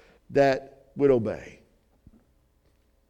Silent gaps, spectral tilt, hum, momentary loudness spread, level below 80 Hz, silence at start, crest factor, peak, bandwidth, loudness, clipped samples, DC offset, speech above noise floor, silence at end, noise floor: none; -7 dB/octave; none; 19 LU; -56 dBFS; 0.3 s; 18 dB; -10 dBFS; 8.2 kHz; -25 LUFS; under 0.1%; under 0.1%; 42 dB; 1.6 s; -65 dBFS